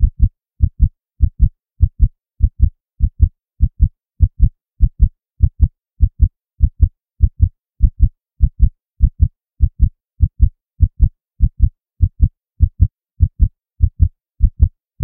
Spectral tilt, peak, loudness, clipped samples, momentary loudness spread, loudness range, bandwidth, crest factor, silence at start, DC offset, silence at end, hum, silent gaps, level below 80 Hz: -15.5 dB/octave; 0 dBFS; -19 LUFS; 0.2%; 4 LU; 0 LU; 0.6 kHz; 16 dB; 0 s; 0.2%; 0 s; none; none; -16 dBFS